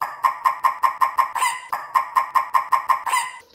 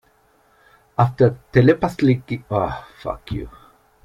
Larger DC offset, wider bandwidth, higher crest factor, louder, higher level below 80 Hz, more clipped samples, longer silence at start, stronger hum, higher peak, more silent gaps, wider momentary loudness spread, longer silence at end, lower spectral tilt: neither; first, 16.5 kHz vs 11.5 kHz; about the same, 18 dB vs 18 dB; about the same, -21 LUFS vs -20 LUFS; second, -72 dBFS vs -44 dBFS; neither; second, 0 s vs 1 s; neither; about the same, -4 dBFS vs -2 dBFS; neither; second, 3 LU vs 15 LU; second, 0.15 s vs 0.55 s; second, 1 dB/octave vs -8.5 dB/octave